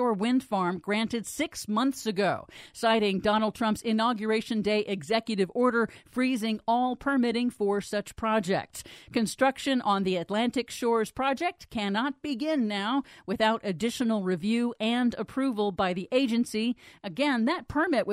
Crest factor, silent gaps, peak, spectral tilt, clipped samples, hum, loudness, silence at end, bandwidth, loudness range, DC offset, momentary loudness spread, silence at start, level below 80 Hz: 18 dB; none; -10 dBFS; -5 dB/octave; under 0.1%; none; -28 LUFS; 0 s; 15.5 kHz; 1 LU; under 0.1%; 6 LU; 0 s; -60 dBFS